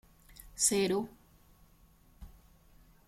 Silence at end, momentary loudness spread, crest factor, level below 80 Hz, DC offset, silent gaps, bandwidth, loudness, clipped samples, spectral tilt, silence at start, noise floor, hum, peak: 0.8 s; 23 LU; 24 dB; -60 dBFS; under 0.1%; none; 16.5 kHz; -30 LUFS; under 0.1%; -3 dB/octave; 0.45 s; -63 dBFS; none; -14 dBFS